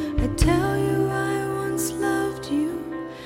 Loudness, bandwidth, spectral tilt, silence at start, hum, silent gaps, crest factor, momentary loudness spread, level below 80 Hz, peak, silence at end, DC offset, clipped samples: -24 LUFS; 16.5 kHz; -5.5 dB/octave; 0 s; none; none; 18 dB; 6 LU; -32 dBFS; -4 dBFS; 0 s; under 0.1%; under 0.1%